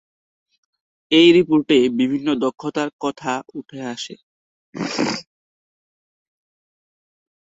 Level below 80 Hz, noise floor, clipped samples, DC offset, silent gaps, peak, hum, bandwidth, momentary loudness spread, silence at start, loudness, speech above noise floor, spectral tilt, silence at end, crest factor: -64 dBFS; under -90 dBFS; under 0.1%; under 0.1%; 2.93-2.99 s, 4.23-4.73 s; -2 dBFS; none; 8 kHz; 18 LU; 1.1 s; -18 LUFS; over 72 dB; -5 dB/octave; 2.2 s; 20 dB